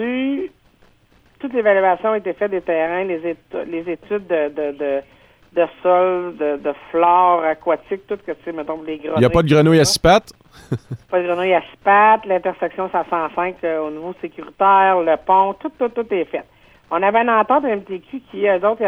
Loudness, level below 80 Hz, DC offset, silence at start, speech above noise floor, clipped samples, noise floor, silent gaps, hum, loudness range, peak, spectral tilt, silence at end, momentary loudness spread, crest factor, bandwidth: -18 LUFS; -46 dBFS; under 0.1%; 0 s; 37 dB; under 0.1%; -54 dBFS; none; none; 5 LU; -2 dBFS; -5.5 dB/octave; 0 s; 14 LU; 16 dB; 15.5 kHz